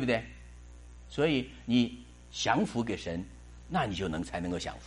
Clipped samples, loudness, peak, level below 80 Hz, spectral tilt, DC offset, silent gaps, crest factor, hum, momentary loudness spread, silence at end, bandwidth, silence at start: under 0.1%; -32 LUFS; -12 dBFS; -50 dBFS; -5 dB/octave; under 0.1%; none; 22 dB; 60 Hz at -50 dBFS; 23 LU; 0 s; 11.5 kHz; 0 s